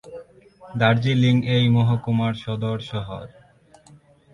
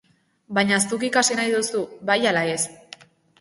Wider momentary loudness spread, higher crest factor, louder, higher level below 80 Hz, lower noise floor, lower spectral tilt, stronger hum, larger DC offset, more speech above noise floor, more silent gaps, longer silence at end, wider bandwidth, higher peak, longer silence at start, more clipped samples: first, 17 LU vs 7 LU; about the same, 20 dB vs 18 dB; about the same, -21 LUFS vs -21 LUFS; first, -52 dBFS vs -66 dBFS; first, -53 dBFS vs -47 dBFS; first, -7.5 dB/octave vs -2.5 dB/octave; neither; neither; first, 32 dB vs 25 dB; neither; first, 1.05 s vs 0.65 s; second, 7 kHz vs 11.5 kHz; about the same, -4 dBFS vs -4 dBFS; second, 0.05 s vs 0.5 s; neither